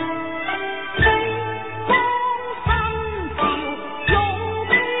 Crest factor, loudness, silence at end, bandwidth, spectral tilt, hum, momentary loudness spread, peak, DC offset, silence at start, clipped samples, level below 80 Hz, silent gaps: 18 dB; -21 LUFS; 0 s; 4 kHz; -10 dB/octave; none; 9 LU; -4 dBFS; 0.8%; 0 s; under 0.1%; -34 dBFS; none